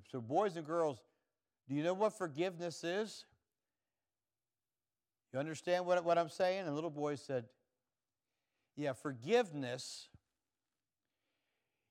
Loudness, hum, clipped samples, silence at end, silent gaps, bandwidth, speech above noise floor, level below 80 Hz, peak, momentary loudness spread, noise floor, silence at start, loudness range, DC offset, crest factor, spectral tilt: -38 LUFS; none; under 0.1%; 1.85 s; none; 14.5 kHz; over 52 dB; under -90 dBFS; -22 dBFS; 11 LU; under -90 dBFS; 0.15 s; 5 LU; under 0.1%; 20 dB; -5 dB/octave